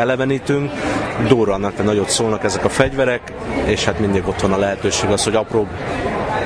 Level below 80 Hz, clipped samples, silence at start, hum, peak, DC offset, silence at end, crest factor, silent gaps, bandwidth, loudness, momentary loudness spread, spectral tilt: -36 dBFS; under 0.1%; 0 s; none; 0 dBFS; under 0.1%; 0 s; 18 dB; none; 10.5 kHz; -18 LUFS; 5 LU; -4.5 dB/octave